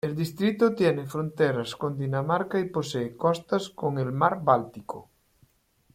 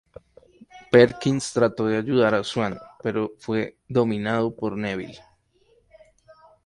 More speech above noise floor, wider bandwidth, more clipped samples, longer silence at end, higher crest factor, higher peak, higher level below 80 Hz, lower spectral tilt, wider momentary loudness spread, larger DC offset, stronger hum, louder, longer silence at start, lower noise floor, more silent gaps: about the same, 39 dB vs 40 dB; first, 16.5 kHz vs 11.5 kHz; neither; second, 0.95 s vs 1.5 s; about the same, 20 dB vs 22 dB; second, -6 dBFS vs -2 dBFS; second, -64 dBFS vs -58 dBFS; about the same, -6.5 dB/octave vs -6 dB/octave; second, 8 LU vs 12 LU; neither; neither; second, -26 LUFS vs -23 LUFS; second, 0.05 s vs 0.75 s; about the same, -65 dBFS vs -62 dBFS; neither